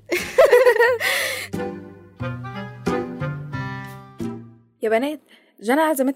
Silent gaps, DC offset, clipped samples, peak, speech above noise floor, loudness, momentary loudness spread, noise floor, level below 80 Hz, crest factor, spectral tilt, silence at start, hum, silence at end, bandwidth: none; under 0.1%; under 0.1%; -4 dBFS; 20 dB; -20 LUFS; 18 LU; -40 dBFS; -56 dBFS; 18 dB; -4.5 dB/octave; 0.1 s; none; 0 s; 16 kHz